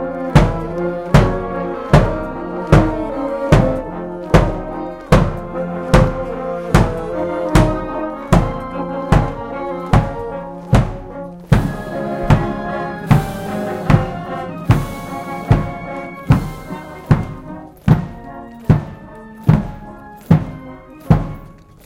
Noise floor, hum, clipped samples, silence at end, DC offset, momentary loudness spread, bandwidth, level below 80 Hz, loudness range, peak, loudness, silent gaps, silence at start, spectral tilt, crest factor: -38 dBFS; none; under 0.1%; 0.3 s; under 0.1%; 16 LU; 15.5 kHz; -26 dBFS; 3 LU; 0 dBFS; -17 LUFS; none; 0 s; -7.5 dB/octave; 16 dB